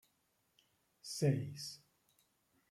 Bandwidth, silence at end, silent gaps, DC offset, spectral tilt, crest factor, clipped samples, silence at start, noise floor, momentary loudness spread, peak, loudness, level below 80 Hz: 15.5 kHz; 0.95 s; none; under 0.1%; -5.5 dB/octave; 22 dB; under 0.1%; 1.05 s; -80 dBFS; 19 LU; -22 dBFS; -39 LUFS; -80 dBFS